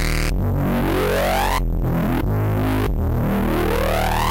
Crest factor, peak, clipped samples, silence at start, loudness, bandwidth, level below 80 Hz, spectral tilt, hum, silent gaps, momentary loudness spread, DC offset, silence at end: 8 dB; -10 dBFS; under 0.1%; 0 s; -20 LUFS; 17 kHz; -24 dBFS; -6 dB/octave; none; none; 2 LU; under 0.1%; 0 s